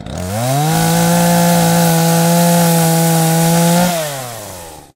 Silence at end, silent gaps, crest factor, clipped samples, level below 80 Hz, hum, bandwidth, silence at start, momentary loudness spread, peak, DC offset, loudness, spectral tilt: 0.15 s; none; 12 dB; under 0.1%; -42 dBFS; none; 16 kHz; 0 s; 12 LU; 0 dBFS; under 0.1%; -12 LUFS; -5 dB/octave